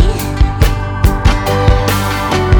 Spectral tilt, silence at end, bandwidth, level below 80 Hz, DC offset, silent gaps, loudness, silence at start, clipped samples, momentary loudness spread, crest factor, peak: -5.5 dB/octave; 0 s; over 20 kHz; -14 dBFS; under 0.1%; none; -13 LUFS; 0 s; 0.8%; 3 LU; 10 dB; 0 dBFS